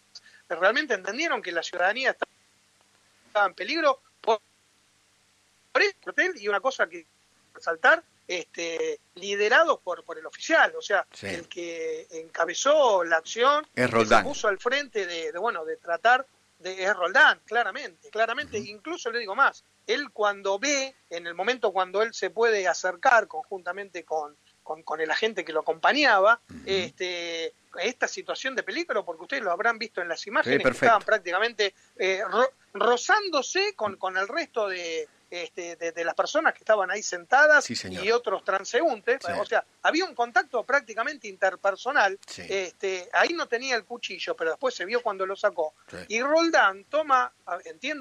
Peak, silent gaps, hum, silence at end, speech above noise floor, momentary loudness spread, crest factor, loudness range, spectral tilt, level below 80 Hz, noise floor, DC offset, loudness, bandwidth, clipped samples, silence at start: -8 dBFS; none; none; 0 s; 39 dB; 14 LU; 18 dB; 4 LU; -2 dB/octave; -64 dBFS; -64 dBFS; under 0.1%; -25 LUFS; 11 kHz; under 0.1%; 0.15 s